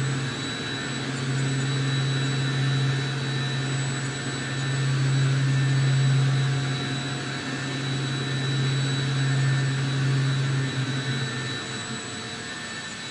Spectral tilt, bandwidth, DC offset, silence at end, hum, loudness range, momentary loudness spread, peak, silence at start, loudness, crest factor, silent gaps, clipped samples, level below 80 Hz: -5 dB/octave; 11 kHz; under 0.1%; 0 s; none; 2 LU; 7 LU; -12 dBFS; 0 s; -26 LUFS; 12 dB; none; under 0.1%; -58 dBFS